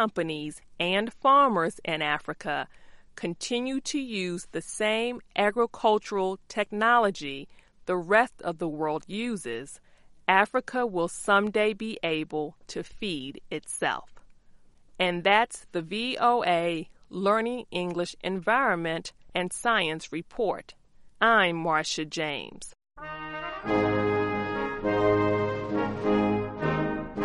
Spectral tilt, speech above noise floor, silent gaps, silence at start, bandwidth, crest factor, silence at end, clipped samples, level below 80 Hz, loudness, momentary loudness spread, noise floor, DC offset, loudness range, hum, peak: -4.5 dB/octave; 27 dB; none; 0 s; 11.5 kHz; 22 dB; 0 s; under 0.1%; -56 dBFS; -27 LUFS; 13 LU; -54 dBFS; under 0.1%; 3 LU; none; -6 dBFS